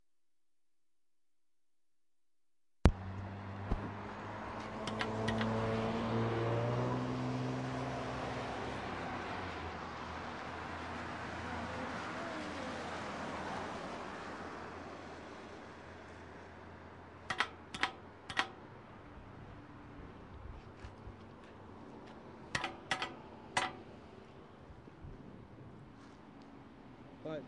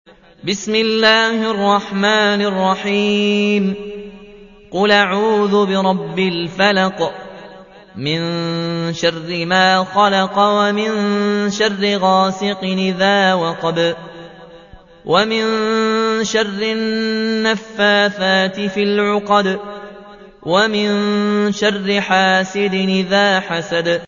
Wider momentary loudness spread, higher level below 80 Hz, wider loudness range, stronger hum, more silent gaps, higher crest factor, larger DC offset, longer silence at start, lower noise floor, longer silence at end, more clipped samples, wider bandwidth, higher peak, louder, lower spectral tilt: first, 18 LU vs 9 LU; about the same, -52 dBFS vs -54 dBFS; first, 12 LU vs 3 LU; neither; neither; first, 34 dB vs 16 dB; neither; first, 2.85 s vs 0.45 s; first, under -90 dBFS vs -41 dBFS; about the same, 0 s vs 0 s; neither; first, 11.5 kHz vs 7.4 kHz; second, -8 dBFS vs 0 dBFS; second, -40 LUFS vs -16 LUFS; about the same, -5.5 dB/octave vs -4.5 dB/octave